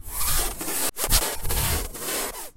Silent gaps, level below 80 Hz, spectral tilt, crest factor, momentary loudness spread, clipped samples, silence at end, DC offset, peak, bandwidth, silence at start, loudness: none; -32 dBFS; -2 dB/octave; 22 dB; 6 LU; under 0.1%; 0.05 s; under 0.1%; -4 dBFS; 16 kHz; 0.05 s; -24 LUFS